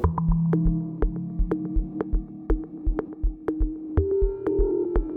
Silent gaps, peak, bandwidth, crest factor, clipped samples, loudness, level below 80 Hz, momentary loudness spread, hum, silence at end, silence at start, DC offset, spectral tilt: none; -8 dBFS; 2.5 kHz; 16 dB; under 0.1%; -27 LUFS; -28 dBFS; 7 LU; none; 0 s; 0 s; under 0.1%; -12.5 dB/octave